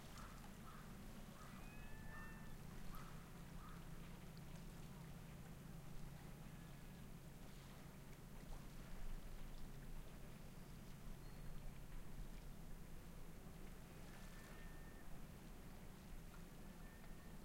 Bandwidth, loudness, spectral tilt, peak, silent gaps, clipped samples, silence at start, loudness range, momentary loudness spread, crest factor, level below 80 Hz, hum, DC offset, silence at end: 16 kHz; -59 LUFS; -5 dB/octave; -38 dBFS; none; under 0.1%; 0 s; 2 LU; 3 LU; 16 dB; -58 dBFS; none; under 0.1%; 0 s